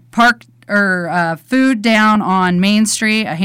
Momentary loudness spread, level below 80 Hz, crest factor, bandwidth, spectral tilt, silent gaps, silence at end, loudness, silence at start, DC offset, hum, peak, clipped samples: 6 LU; -52 dBFS; 8 dB; 16 kHz; -4.5 dB/octave; none; 0 s; -13 LUFS; 0.15 s; under 0.1%; none; -4 dBFS; under 0.1%